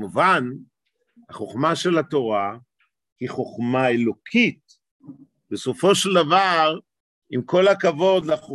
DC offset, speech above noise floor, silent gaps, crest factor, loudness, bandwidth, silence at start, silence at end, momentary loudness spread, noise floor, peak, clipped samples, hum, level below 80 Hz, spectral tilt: under 0.1%; 39 dB; 3.12-3.16 s, 4.91-5.00 s, 7.00-7.22 s; 18 dB; -20 LUFS; 12.5 kHz; 0 s; 0 s; 15 LU; -59 dBFS; -4 dBFS; under 0.1%; none; -66 dBFS; -4.5 dB/octave